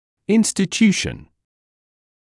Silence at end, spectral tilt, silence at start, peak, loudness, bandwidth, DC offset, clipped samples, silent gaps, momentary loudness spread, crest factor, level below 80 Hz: 1.1 s; -4.5 dB/octave; 0.3 s; -4 dBFS; -18 LUFS; 12 kHz; under 0.1%; under 0.1%; none; 11 LU; 18 dB; -50 dBFS